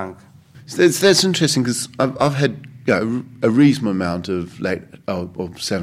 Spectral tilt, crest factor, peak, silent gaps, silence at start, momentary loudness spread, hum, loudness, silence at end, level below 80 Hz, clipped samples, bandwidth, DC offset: -4.5 dB/octave; 18 dB; 0 dBFS; none; 0 s; 13 LU; none; -18 LUFS; 0 s; -56 dBFS; under 0.1%; 16 kHz; under 0.1%